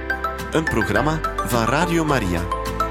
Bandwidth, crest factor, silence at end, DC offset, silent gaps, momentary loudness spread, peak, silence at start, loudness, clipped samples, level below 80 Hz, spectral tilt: 16.5 kHz; 16 dB; 0 s; under 0.1%; none; 5 LU; -4 dBFS; 0 s; -21 LUFS; under 0.1%; -32 dBFS; -5.5 dB/octave